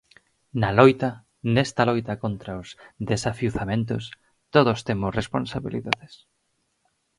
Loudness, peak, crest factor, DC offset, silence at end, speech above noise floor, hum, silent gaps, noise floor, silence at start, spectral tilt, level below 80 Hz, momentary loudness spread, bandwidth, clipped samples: -24 LUFS; 0 dBFS; 24 dB; under 0.1%; 1.05 s; 49 dB; none; none; -72 dBFS; 0.55 s; -6 dB/octave; -48 dBFS; 16 LU; 11.5 kHz; under 0.1%